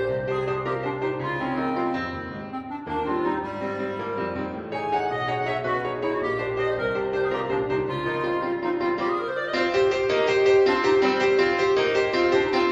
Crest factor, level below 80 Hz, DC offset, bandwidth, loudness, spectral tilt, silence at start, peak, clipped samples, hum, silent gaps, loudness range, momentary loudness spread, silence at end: 16 dB; -54 dBFS; under 0.1%; 7.8 kHz; -24 LUFS; -6 dB/octave; 0 s; -8 dBFS; under 0.1%; none; none; 7 LU; 9 LU; 0 s